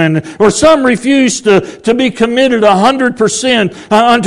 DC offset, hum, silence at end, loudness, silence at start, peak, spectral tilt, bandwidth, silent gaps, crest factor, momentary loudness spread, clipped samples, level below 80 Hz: under 0.1%; none; 0 s; -10 LUFS; 0 s; 0 dBFS; -4.5 dB/octave; 12 kHz; none; 10 dB; 4 LU; 2%; -42 dBFS